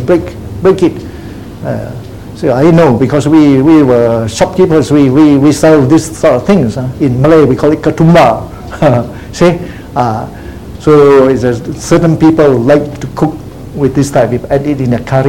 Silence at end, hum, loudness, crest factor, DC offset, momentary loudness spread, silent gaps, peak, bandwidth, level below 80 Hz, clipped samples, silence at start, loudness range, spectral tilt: 0 s; none; -8 LUFS; 8 dB; 0.9%; 16 LU; none; 0 dBFS; 16.5 kHz; -32 dBFS; 2%; 0 s; 3 LU; -7 dB/octave